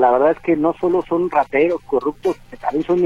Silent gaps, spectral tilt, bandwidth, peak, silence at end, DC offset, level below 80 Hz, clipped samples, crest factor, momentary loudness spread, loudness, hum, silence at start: none; -7.5 dB/octave; 7.6 kHz; -2 dBFS; 0 s; under 0.1%; -48 dBFS; under 0.1%; 16 dB; 7 LU; -19 LUFS; none; 0 s